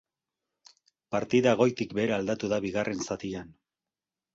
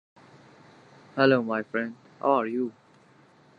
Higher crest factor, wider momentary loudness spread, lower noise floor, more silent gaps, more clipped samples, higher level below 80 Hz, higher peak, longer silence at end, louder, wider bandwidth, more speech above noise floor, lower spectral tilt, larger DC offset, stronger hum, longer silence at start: about the same, 22 dB vs 24 dB; second, 10 LU vs 13 LU; first, under -90 dBFS vs -58 dBFS; neither; neither; first, -62 dBFS vs -80 dBFS; about the same, -8 dBFS vs -6 dBFS; about the same, 0.85 s vs 0.85 s; about the same, -28 LUFS vs -26 LUFS; first, 8 kHz vs 7 kHz; first, over 62 dB vs 33 dB; second, -5.5 dB/octave vs -7.5 dB/octave; neither; neither; about the same, 1.1 s vs 1.15 s